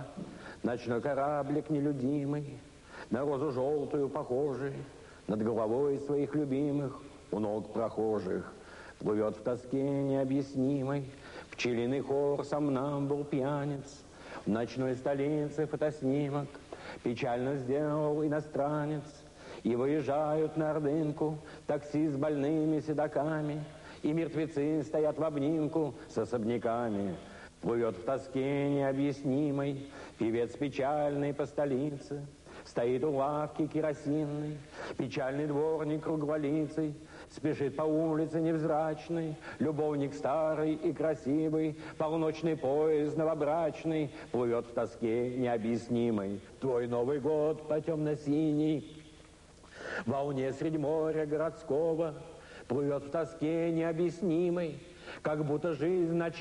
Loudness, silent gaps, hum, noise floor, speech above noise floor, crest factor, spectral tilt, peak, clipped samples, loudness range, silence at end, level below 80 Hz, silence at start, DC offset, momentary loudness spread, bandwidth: -33 LUFS; none; none; -56 dBFS; 24 dB; 14 dB; -7.5 dB/octave; -20 dBFS; under 0.1%; 2 LU; 0 s; -62 dBFS; 0 s; under 0.1%; 10 LU; 11 kHz